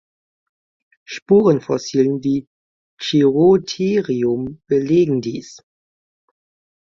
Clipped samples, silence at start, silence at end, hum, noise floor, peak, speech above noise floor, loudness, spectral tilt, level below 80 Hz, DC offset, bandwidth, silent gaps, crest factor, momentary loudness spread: under 0.1%; 1.1 s; 1.3 s; none; under -90 dBFS; -2 dBFS; over 73 dB; -17 LUFS; -6.5 dB/octave; -58 dBFS; under 0.1%; 7.4 kHz; 1.22-1.26 s, 2.47-2.97 s; 16 dB; 14 LU